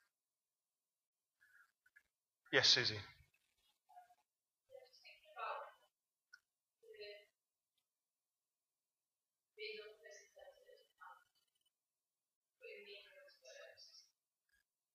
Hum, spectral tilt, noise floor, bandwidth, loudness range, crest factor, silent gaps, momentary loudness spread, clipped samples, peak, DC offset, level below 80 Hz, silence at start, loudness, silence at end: none; -1.5 dB/octave; under -90 dBFS; 15.5 kHz; 23 LU; 32 dB; 12.36-12.42 s; 29 LU; under 0.1%; -18 dBFS; under 0.1%; -88 dBFS; 2.5 s; -37 LUFS; 0.95 s